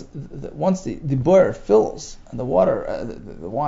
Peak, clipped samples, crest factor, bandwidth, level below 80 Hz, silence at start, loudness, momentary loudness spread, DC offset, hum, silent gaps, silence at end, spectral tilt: -4 dBFS; under 0.1%; 16 dB; 7.8 kHz; -42 dBFS; 0 s; -20 LUFS; 18 LU; under 0.1%; none; none; 0 s; -7.5 dB/octave